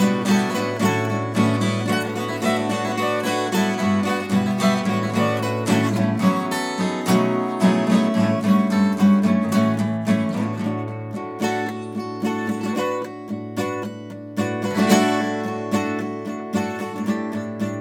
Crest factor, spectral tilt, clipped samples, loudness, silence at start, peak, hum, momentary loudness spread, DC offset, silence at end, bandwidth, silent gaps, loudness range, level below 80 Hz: 20 dB; -6 dB/octave; under 0.1%; -21 LUFS; 0 s; -2 dBFS; none; 10 LU; under 0.1%; 0 s; 17 kHz; none; 7 LU; -70 dBFS